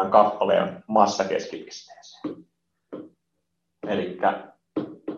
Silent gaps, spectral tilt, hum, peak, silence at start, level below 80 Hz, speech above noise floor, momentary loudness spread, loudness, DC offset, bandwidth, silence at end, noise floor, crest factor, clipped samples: none; -5 dB/octave; none; -2 dBFS; 0 s; -72 dBFS; 56 dB; 21 LU; -24 LUFS; under 0.1%; 7.6 kHz; 0 s; -78 dBFS; 24 dB; under 0.1%